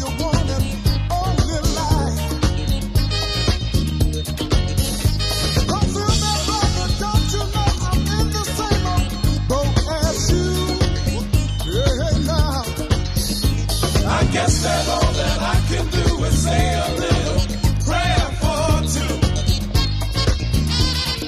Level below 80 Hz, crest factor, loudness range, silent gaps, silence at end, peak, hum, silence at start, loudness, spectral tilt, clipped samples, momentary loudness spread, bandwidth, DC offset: -22 dBFS; 16 dB; 2 LU; none; 0 s; -2 dBFS; none; 0 s; -19 LUFS; -4.5 dB/octave; under 0.1%; 3 LU; 15.5 kHz; under 0.1%